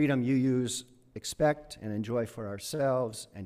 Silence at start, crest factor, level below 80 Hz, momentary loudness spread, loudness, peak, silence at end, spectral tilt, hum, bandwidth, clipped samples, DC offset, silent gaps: 0 s; 16 dB; -60 dBFS; 11 LU; -31 LUFS; -14 dBFS; 0 s; -5.5 dB/octave; none; 15.5 kHz; under 0.1%; under 0.1%; none